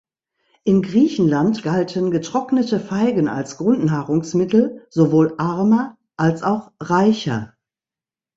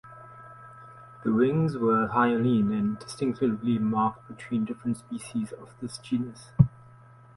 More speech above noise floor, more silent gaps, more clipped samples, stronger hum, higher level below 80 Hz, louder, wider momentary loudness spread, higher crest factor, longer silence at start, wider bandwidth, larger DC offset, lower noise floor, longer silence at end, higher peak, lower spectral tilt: first, over 72 dB vs 26 dB; neither; neither; neither; about the same, -56 dBFS vs -56 dBFS; first, -19 LUFS vs -27 LUFS; second, 6 LU vs 23 LU; second, 16 dB vs 24 dB; first, 0.65 s vs 0.05 s; second, 7.8 kHz vs 11.5 kHz; neither; first, under -90 dBFS vs -52 dBFS; first, 0.9 s vs 0.65 s; about the same, -4 dBFS vs -4 dBFS; about the same, -7 dB/octave vs -7.5 dB/octave